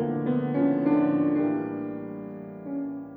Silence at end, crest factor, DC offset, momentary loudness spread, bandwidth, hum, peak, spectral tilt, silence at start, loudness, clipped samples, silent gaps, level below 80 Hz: 0 s; 14 dB; under 0.1%; 14 LU; 3.8 kHz; none; -12 dBFS; -12 dB/octave; 0 s; -26 LUFS; under 0.1%; none; -66 dBFS